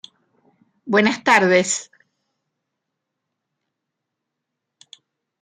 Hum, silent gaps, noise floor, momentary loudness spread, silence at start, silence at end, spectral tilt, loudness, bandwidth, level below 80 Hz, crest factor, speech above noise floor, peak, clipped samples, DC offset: none; none; -81 dBFS; 9 LU; 0.85 s; 3.6 s; -3.5 dB/octave; -17 LUFS; 13 kHz; -70 dBFS; 24 dB; 64 dB; 0 dBFS; under 0.1%; under 0.1%